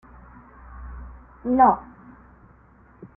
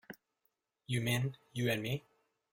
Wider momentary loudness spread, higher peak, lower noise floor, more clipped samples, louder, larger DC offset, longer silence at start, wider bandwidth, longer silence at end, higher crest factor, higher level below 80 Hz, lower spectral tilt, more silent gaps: first, 27 LU vs 14 LU; first, -4 dBFS vs -20 dBFS; second, -53 dBFS vs -82 dBFS; neither; first, -20 LUFS vs -36 LUFS; neither; first, 0.75 s vs 0.1 s; second, 2.9 kHz vs 16.5 kHz; first, 1.35 s vs 0.5 s; about the same, 22 dB vs 18 dB; first, -46 dBFS vs -66 dBFS; first, -12 dB/octave vs -5 dB/octave; neither